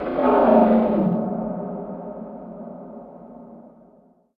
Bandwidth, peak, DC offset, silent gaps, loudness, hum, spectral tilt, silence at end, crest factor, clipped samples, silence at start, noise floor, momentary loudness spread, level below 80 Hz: 4.6 kHz; -4 dBFS; under 0.1%; none; -19 LUFS; none; -11 dB/octave; 0.75 s; 18 dB; under 0.1%; 0 s; -55 dBFS; 25 LU; -52 dBFS